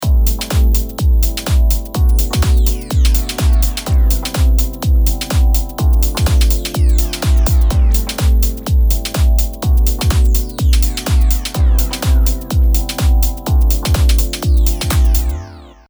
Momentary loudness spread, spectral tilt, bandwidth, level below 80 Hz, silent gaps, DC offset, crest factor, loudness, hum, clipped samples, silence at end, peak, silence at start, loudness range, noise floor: 2 LU; -5 dB/octave; over 20 kHz; -12 dBFS; none; under 0.1%; 12 dB; -15 LUFS; none; under 0.1%; 0.2 s; 0 dBFS; 0 s; 1 LU; -33 dBFS